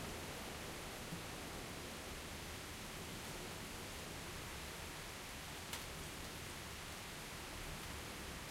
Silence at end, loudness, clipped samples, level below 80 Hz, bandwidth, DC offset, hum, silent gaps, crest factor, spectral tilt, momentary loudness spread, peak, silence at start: 0 s; -48 LUFS; under 0.1%; -58 dBFS; 16 kHz; under 0.1%; none; none; 18 dB; -3 dB/octave; 1 LU; -30 dBFS; 0 s